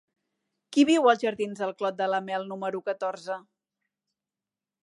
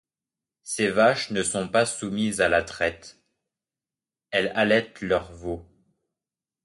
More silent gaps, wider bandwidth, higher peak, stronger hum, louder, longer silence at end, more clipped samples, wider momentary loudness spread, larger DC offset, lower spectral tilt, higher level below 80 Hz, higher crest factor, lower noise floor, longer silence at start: neither; about the same, 11 kHz vs 11.5 kHz; about the same, -6 dBFS vs -6 dBFS; neither; second, -27 LUFS vs -24 LUFS; first, 1.45 s vs 1.05 s; neither; about the same, 13 LU vs 14 LU; neither; about the same, -4.5 dB/octave vs -3.5 dB/octave; second, -80 dBFS vs -54 dBFS; about the same, 22 dB vs 20 dB; about the same, under -90 dBFS vs under -90 dBFS; about the same, 0.7 s vs 0.65 s